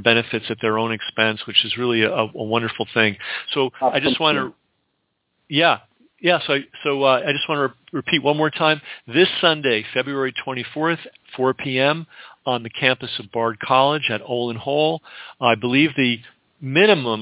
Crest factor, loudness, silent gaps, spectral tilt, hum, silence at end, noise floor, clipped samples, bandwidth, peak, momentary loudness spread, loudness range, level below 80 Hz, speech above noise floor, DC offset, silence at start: 20 dB; -20 LUFS; none; -9 dB/octave; none; 0 s; -72 dBFS; under 0.1%; 4 kHz; 0 dBFS; 9 LU; 2 LU; -64 dBFS; 52 dB; under 0.1%; 0 s